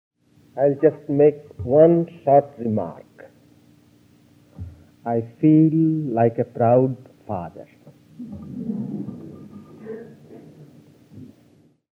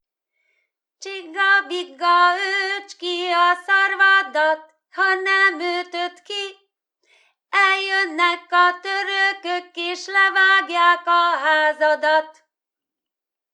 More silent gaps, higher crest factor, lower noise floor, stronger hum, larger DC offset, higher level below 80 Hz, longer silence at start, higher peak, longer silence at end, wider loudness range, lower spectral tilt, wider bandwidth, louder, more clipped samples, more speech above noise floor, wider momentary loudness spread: neither; about the same, 20 dB vs 18 dB; second, -56 dBFS vs -87 dBFS; neither; neither; first, -58 dBFS vs under -90 dBFS; second, 0.55 s vs 1 s; about the same, -4 dBFS vs -2 dBFS; second, 0.7 s vs 1.2 s; first, 16 LU vs 3 LU; first, -11.5 dB/octave vs 1.5 dB/octave; second, 3.3 kHz vs 11 kHz; about the same, -20 LUFS vs -18 LUFS; neither; second, 37 dB vs 68 dB; first, 24 LU vs 13 LU